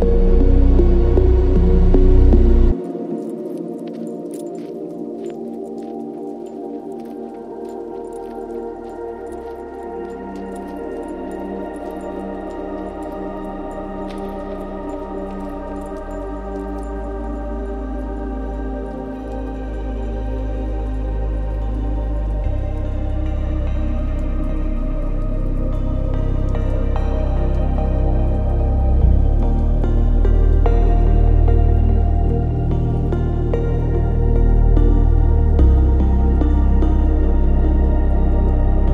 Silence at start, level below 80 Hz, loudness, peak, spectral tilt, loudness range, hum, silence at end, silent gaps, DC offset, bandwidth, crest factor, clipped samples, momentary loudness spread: 0 s; -18 dBFS; -21 LUFS; 0 dBFS; -10 dB/octave; 13 LU; none; 0 s; none; under 0.1%; 3.9 kHz; 16 dB; under 0.1%; 13 LU